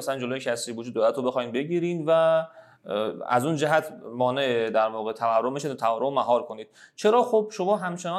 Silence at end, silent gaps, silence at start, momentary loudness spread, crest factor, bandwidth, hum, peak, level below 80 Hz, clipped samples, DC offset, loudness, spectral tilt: 0 s; none; 0 s; 8 LU; 18 dB; 14 kHz; none; -8 dBFS; -82 dBFS; under 0.1%; under 0.1%; -25 LUFS; -5 dB/octave